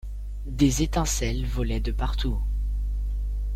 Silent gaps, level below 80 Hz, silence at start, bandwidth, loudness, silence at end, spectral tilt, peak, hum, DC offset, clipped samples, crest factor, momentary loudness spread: none; -28 dBFS; 0.05 s; 14.5 kHz; -27 LUFS; 0 s; -5 dB/octave; -8 dBFS; 50 Hz at -25 dBFS; under 0.1%; under 0.1%; 16 dB; 8 LU